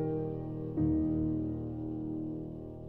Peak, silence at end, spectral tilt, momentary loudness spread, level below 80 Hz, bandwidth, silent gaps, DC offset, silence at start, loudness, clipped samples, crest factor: -22 dBFS; 0 s; -13 dB/octave; 9 LU; -48 dBFS; 3 kHz; none; under 0.1%; 0 s; -35 LUFS; under 0.1%; 14 dB